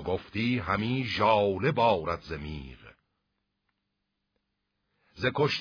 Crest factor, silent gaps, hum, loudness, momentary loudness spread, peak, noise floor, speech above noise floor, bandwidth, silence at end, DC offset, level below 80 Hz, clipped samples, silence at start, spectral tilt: 20 dB; none; 50 Hz at -55 dBFS; -28 LUFS; 14 LU; -10 dBFS; -81 dBFS; 54 dB; 5.4 kHz; 0 s; under 0.1%; -54 dBFS; under 0.1%; 0 s; -7 dB/octave